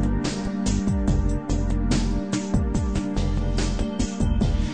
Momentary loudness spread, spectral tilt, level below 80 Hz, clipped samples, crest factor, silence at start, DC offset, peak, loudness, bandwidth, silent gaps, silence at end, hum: 3 LU; -6 dB/octave; -26 dBFS; under 0.1%; 14 dB; 0 s; 0.5%; -8 dBFS; -25 LUFS; 9.4 kHz; none; 0 s; none